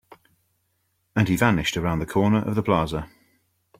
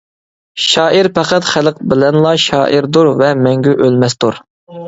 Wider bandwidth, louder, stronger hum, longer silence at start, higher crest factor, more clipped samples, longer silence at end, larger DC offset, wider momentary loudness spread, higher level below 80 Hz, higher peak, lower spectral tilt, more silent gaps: first, 16.5 kHz vs 8 kHz; second, -23 LUFS vs -11 LUFS; neither; first, 1.15 s vs 0.55 s; first, 20 dB vs 12 dB; neither; first, 0.75 s vs 0 s; neither; first, 10 LU vs 6 LU; about the same, -46 dBFS vs -50 dBFS; second, -4 dBFS vs 0 dBFS; about the same, -6 dB/octave vs -5 dB/octave; second, none vs 4.50-4.67 s